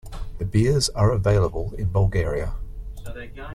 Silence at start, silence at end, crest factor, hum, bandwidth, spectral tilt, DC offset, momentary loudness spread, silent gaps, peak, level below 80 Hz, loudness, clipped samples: 0.05 s; 0 s; 16 dB; none; 13 kHz; -6 dB/octave; under 0.1%; 18 LU; none; -6 dBFS; -32 dBFS; -22 LUFS; under 0.1%